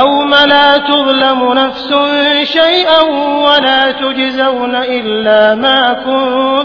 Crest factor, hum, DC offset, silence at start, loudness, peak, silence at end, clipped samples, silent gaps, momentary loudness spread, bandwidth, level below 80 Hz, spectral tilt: 10 dB; none; under 0.1%; 0 s; -9 LUFS; 0 dBFS; 0 s; 0.5%; none; 6 LU; 5.4 kHz; -46 dBFS; -4.5 dB/octave